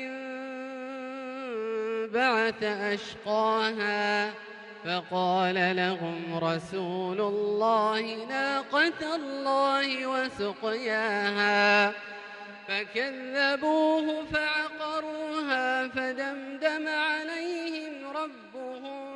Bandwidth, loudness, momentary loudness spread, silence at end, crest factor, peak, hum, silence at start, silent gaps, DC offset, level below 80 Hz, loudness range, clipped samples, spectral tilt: 11 kHz; -28 LUFS; 13 LU; 0 s; 18 dB; -12 dBFS; none; 0 s; none; under 0.1%; -68 dBFS; 4 LU; under 0.1%; -4.5 dB/octave